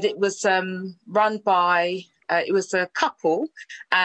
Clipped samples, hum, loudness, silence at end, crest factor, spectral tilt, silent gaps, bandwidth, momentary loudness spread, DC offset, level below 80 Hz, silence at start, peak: under 0.1%; none; -23 LUFS; 0 s; 18 dB; -3.5 dB/octave; none; 9.2 kHz; 12 LU; under 0.1%; -76 dBFS; 0 s; -4 dBFS